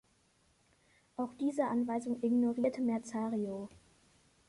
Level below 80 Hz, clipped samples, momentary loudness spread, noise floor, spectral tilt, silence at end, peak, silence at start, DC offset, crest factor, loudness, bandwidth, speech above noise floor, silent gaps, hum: -74 dBFS; under 0.1%; 11 LU; -71 dBFS; -7 dB/octave; 0.75 s; -20 dBFS; 1.2 s; under 0.1%; 16 dB; -35 LUFS; 11.5 kHz; 37 dB; none; none